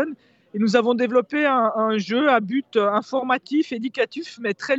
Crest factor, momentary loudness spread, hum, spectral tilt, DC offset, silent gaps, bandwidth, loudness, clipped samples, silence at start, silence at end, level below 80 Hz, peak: 18 dB; 8 LU; none; -5.5 dB/octave; under 0.1%; none; 8 kHz; -21 LUFS; under 0.1%; 0 s; 0 s; -74 dBFS; -4 dBFS